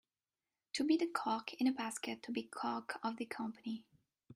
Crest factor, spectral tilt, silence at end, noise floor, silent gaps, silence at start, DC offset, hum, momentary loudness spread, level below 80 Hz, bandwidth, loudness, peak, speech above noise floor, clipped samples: 18 dB; -3.5 dB/octave; 0 s; under -90 dBFS; none; 0.75 s; under 0.1%; none; 10 LU; -86 dBFS; 15.5 kHz; -39 LUFS; -22 dBFS; over 51 dB; under 0.1%